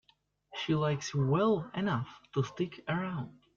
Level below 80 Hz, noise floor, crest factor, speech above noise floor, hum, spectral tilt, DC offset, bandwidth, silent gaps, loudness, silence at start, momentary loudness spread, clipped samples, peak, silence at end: -66 dBFS; -71 dBFS; 16 dB; 39 dB; none; -6.5 dB/octave; under 0.1%; 7.6 kHz; none; -33 LUFS; 0.5 s; 10 LU; under 0.1%; -18 dBFS; 0.25 s